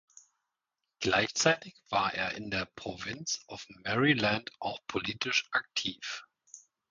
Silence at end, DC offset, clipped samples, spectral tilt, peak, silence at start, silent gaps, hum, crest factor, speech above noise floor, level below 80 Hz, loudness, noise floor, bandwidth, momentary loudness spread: 0.3 s; under 0.1%; under 0.1%; -3 dB/octave; -10 dBFS; 1 s; none; none; 22 dB; 55 dB; -64 dBFS; -31 LUFS; -87 dBFS; 10 kHz; 13 LU